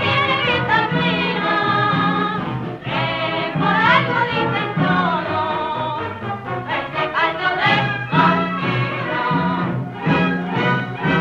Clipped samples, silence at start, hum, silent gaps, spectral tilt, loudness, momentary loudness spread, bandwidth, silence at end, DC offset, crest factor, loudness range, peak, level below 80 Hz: under 0.1%; 0 s; none; none; -7 dB/octave; -19 LUFS; 8 LU; 7.2 kHz; 0 s; under 0.1%; 16 dB; 2 LU; -2 dBFS; -50 dBFS